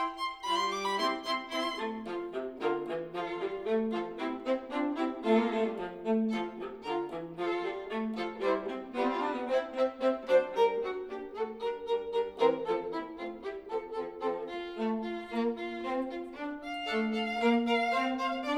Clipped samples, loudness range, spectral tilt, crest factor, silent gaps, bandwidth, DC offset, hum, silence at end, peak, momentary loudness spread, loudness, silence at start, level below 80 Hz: under 0.1%; 4 LU; -5 dB/octave; 18 dB; none; 12.5 kHz; under 0.1%; none; 0 s; -14 dBFS; 10 LU; -33 LUFS; 0 s; -66 dBFS